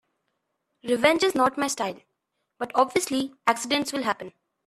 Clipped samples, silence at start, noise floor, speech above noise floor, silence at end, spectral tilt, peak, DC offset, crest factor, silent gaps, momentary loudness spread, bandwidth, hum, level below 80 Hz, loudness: under 0.1%; 0.85 s; -78 dBFS; 54 dB; 0.35 s; -2.5 dB/octave; -4 dBFS; under 0.1%; 22 dB; none; 12 LU; 14.5 kHz; none; -68 dBFS; -24 LUFS